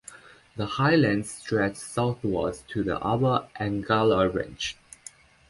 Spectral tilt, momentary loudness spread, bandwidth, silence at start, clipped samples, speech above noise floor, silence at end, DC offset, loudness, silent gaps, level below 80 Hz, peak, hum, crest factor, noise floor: -6 dB/octave; 21 LU; 11.5 kHz; 0.1 s; under 0.1%; 25 dB; 0.75 s; under 0.1%; -26 LUFS; none; -52 dBFS; -10 dBFS; none; 18 dB; -50 dBFS